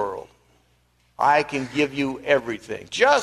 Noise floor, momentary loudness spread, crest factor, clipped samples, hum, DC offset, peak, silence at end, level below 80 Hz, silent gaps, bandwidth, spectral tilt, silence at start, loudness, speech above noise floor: -63 dBFS; 12 LU; 18 dB; under 0.1%; 60 Hz at -55 dBFS; under 0.1%; -4 dBFS; 0 s; -58 dBFS; none; 13 kHz; -4 dB/octave; 0 s; -23 LUFS; 41 dB